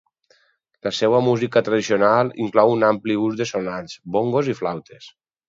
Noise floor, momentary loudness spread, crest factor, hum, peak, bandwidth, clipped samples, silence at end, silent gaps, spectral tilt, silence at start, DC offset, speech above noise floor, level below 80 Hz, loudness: -63 dBFS; 11 LU; 20 dB; none; 0 dBFS; 7.8 kHz; under 0.1%; 0.4 s; none; -6 dB/octave; 0.85 s; under 0.1%; 43 dB; -62 dBFS; -20 LUFS